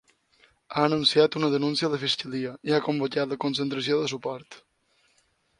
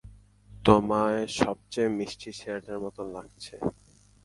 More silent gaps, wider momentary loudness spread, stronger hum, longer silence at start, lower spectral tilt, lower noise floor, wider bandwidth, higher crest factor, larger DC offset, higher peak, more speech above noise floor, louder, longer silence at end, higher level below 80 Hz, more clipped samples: neither; second, 12 LU vs 17 LU; neither; first, 0.7 s vs 0.05 s; about the same, -5 dB/octave vs -5.5 dB/octave; first, -68 dBFS vs -52 dBFS; about the same, 11 kHz vs 11.5 kHz; second, 20 dB vs 26 dB; neither; about the same, -6 dBFS vs -4 dBFS; first, 42 dB vs 24 dB; first, -25 LUFS vs -28 LUFS; first, 1 s vs 0.55 s; second, -68 dBFS vs -52 dBFS; neither